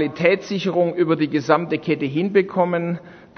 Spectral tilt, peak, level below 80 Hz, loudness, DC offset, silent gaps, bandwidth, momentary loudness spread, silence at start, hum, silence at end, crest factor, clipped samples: -7 dB/octave; 0 dBFS; -64 dBFS; -20 LUFS; under 0.1%; none; 6.6 kHz; 4 LU; 0 s; none; 0.15 s; 20 dB; under 0.1%